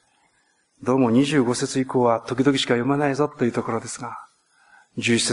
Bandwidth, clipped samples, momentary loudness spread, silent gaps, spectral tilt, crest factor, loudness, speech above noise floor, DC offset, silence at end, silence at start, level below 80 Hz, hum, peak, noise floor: 11 kHz; under 0.1%; 13 LU; none; -4.5 dB/octave; 18 dB; -22 LUFS; 44 dB; under 0.1%; 0 s; 0.8 s; -62 dBFS; none; -6 dBFS; -65 dBFS